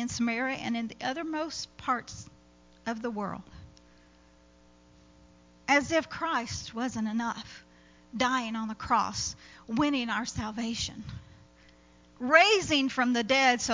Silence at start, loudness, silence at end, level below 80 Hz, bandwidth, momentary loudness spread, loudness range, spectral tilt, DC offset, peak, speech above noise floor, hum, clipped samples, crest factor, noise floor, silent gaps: 0 s; -29 LUFS; 0 s; -56 dBFS; 7.6 kHz; 17 LU; 10 LU; -3 dB/octave; under 0.1%; -6 dBFS; 30 dB; 60 Hz at -60 dBFS; under 0.1%; 24 dB; -59 dBFS; none